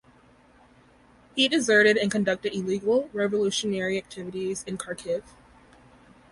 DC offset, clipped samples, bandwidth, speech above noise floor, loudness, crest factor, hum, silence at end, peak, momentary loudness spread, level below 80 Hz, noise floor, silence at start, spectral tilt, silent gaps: under 0.1%; under 0.1%; 11.5 kHz; 32 dB; -25 LUFS; 20 dB; none; 1.1 s; -8 dBFS; 14 LU; -62 dBFS; -57 dBFS; 1.35 s; -3.5 dB/octave; none